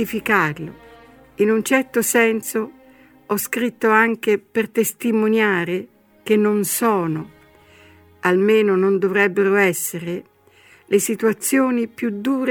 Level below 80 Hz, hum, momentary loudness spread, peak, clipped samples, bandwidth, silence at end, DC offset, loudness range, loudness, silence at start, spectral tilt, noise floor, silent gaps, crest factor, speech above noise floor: -62 dBFS; none; 10 LU; -2 dBFS; under 0.1%; 19.5 kHz; 0 s; under 0.1%; 2 LU; -19 LUFS; 0 s; -4.5 dB/octave; -51 dBFS; none; 18 dB; 33 dB